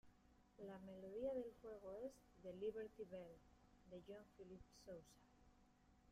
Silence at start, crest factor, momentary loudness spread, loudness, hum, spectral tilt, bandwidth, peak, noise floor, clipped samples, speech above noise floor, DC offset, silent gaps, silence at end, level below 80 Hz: 0.05 s; 18 dB; 14 LU; -55 LUFS; none; -6.5 dB/octave; 15 kHz; -38 dBFS; -74 dBFS; under 0.1%; 20 dB; under 0.1%; none; 0 s; -76 dBFS